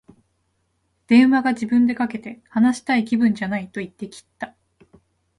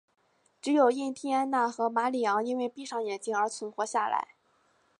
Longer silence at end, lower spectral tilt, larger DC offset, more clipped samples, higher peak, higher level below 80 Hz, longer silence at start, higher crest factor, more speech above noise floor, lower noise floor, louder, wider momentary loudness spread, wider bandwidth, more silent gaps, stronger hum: first, 0.95 s vs 0.75 s; first, -6 dB/octave vs -3.5 dB/octave; neither; neither; first, -4 dBFS vs -12 dBFS; first, -62 dBFS vs -86 dBFS; first, 1.1 s vs 0.65 s; about the same, 18 dB vs 18 dB; first, 50 dB vs 40 dB; about the same, -69 dBFS vs -69 dBFS; first, -19 LUFS vs -29 LUFS; first, 20 LU vs 9 LU; about the same, 11.5 kHz vs 11 kHz; neither; neither